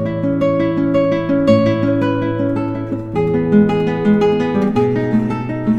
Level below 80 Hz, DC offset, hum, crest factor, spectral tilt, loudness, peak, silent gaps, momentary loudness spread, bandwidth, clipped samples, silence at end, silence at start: -42 dBFS; under 0.1%; none; 14 dB; -9 dB/octave; -16 LUFS; 0 dBFS; none; 7 LU; 7.6 kHz; under 0.1%; 0 s; 0 s